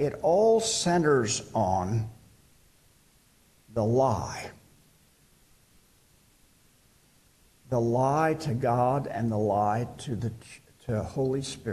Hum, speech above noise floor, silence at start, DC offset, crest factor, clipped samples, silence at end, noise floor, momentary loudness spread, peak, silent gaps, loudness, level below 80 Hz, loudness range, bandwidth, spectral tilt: none; 36 dB; 0 s; under 0.1%; 16 dB; under 0.1%; 0 s; -62 dBFS; 13 LU; -12 dBFS; none; -27 LUFS; -56 dBFS; 6 LU; 13 kHz; -5.5 dB/octave